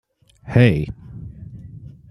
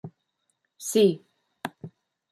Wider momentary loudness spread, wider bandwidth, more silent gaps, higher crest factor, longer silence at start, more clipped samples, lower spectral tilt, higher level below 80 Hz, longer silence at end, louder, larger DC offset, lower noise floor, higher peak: about the same, 24 LU vs 25 LU; second, 9.8 kHz vs 14 kHz; neither; about the same, 22 dB vs 20 dB; first, 0.45 s vs 0.05 s; neither; first, -8.5 dB/octave vs -5 dB/octave; first, -42 dBFS vs -76 dBFS; second, 0.25 s vs 0.45 s; first, -18 LUFS vs -24 LUFS; neither; second, -39 dBFS vs -76 dBFS; first, 0 dBFS vs -10 dBFS